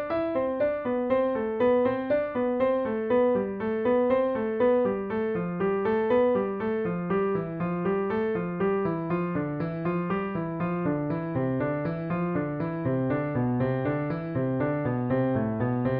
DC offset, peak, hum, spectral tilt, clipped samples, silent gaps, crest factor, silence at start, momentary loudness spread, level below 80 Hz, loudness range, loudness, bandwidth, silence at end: under 0.1%; -12 dBFS; none; -7.5 dB/octave; under 0.1%; none; 14 dB; 0 s; 6 LU; -56 dBFS; 3 LU; -27 LUFS; 4.8 kHz; 0 s